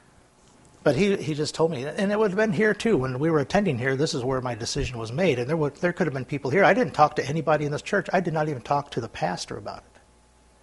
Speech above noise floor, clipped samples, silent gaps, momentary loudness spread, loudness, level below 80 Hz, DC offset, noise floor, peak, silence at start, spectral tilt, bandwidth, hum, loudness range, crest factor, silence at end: 33 dB; under 0.1%; none; 8 LU; -24 LUFS; -50 dBFS; under 0.1%; -57 dBFS; -4 dBFS; 0.85 s; -5.5 dB/octave; 11.5 kHz; none; 2 LU; 20 dB; 0.8 s